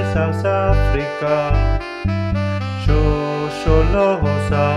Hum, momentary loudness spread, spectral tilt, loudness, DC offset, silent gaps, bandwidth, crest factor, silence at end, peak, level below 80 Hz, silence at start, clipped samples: none; 5 LU; -7.5 dB/octave; -18 LUFS; under 0.1%; none; 10 kHz; 16 dB; 0 s; -2 dBFS; -22 dBFS; 0 s; under 0.1%